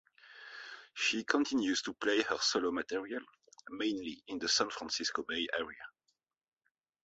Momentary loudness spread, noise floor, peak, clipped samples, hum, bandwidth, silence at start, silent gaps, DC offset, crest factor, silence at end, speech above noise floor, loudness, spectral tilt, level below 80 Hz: 17 LU; -84 dBFS; -12 dBFS; under 0.1%; none; 8 kHz; 0.25 s; none; under 0.1%; 24 dB; 1.15 s; 49 dB; -34 LUFS; 0 dB/octave; -74 dBFS